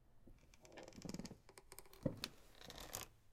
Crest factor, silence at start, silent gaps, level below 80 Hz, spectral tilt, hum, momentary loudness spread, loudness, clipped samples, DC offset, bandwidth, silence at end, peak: 28 dB; 0 s; none; -66 dBFS; -4 dB/octave; none; 19 LU; -52 LUFS; under 0.1%; under 0.1%; 16 kHz; 0 s; -24 dBFS